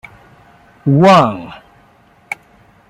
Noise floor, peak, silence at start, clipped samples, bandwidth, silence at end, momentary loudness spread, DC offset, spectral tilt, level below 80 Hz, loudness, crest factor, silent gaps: -49 dBFS; 0 dBFS; 0.85 s; under 0.1%; 12 kHz; 0.55 s; 20 LU; under 0.1%; -7 dB/octave; -52 dBFS; -11 LUFS; 16 dB; none